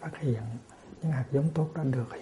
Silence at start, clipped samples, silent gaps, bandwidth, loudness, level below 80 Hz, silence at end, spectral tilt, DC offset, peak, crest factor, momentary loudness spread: 0 s; under 0.1%; none; 11 kHz; -31 LUFS; -60 dBFS; 0 s; -9 dB/octave; under 0.1%; -16 dBFS; 16 dB; 13 LU